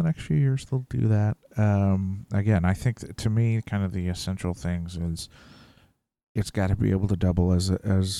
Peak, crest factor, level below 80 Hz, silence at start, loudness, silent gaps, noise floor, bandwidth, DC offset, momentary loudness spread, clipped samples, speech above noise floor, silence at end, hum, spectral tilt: -8 dBFS; 16 dB; -42 dBFS; 0 s; -26 LUFS; 6.23-6.35 s; -62 dBFS; 12.5 kHz; under 0.1%; 8 LU; under 0.1%; 38 dB; 0 s; none; -7 dB/octave